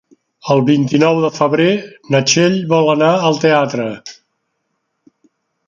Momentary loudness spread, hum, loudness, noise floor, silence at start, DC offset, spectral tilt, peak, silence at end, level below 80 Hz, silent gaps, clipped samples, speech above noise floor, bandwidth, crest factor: 10 LU; none; -14 LUFS; -70 dBFS; 0.45 s; under 0.1%; -5 dB/octave; 0 dBFS; 1.55 s; -60 dBFS; none; under 0.1%; 57 dB; 7.6 kHz; 14 dB